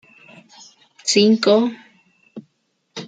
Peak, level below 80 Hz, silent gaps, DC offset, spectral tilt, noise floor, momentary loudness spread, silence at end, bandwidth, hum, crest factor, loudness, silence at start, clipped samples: -2 dBFS; -72 dBFS; none; under 0.1%; -4 dB/octave; -68 dBFS; 12 LU; 0 s; 9.4 kHz; none; 20 dB; -16 LUFS; 1.05 s; under 0.1%